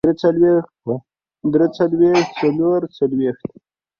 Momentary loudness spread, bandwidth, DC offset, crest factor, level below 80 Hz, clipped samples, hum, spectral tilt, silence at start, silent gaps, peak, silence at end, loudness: 12 LU; 7 kHz; under 0.1%; 14 dB; -56 dBFS; under 0.1%; none; -7.5 dB/octave; 0.05 s; none; -4 dBFS; 0.5 s; -18 LUFS